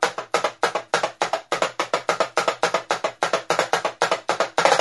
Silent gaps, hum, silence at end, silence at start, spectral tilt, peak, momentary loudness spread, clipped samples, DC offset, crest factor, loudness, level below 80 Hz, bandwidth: none; none; 0 s; 0 s; -2 dB/octave; 0 dBFS; 3 LU; under 0.1%; under 0.1%; 22 dB; -23 LUFS; -68 dBFS; 12 kHz